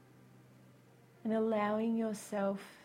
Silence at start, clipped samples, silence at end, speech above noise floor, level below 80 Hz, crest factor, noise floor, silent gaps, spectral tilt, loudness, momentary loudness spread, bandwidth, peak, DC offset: 1.25 s; under 0.1%; 0.05 s; 27 dB; -82 dBFS; 16 dB; -62 dBFS; none; -6 dB/octave; -35 LUFS; 5 LU; 16 kHz; -22 dBFS; under 0.1%